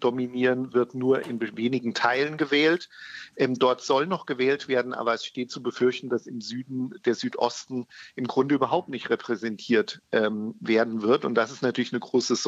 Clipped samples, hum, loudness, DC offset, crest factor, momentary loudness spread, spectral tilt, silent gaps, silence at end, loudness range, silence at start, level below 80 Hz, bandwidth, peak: under 0.1%; none; -26 LUFS; under 0.1%; 20 dB; 10 LU; -4.5 dB/octave; none; 0 s; 3 LU; 0 s; -78 dBFS; 8 kHz; -6 dBFS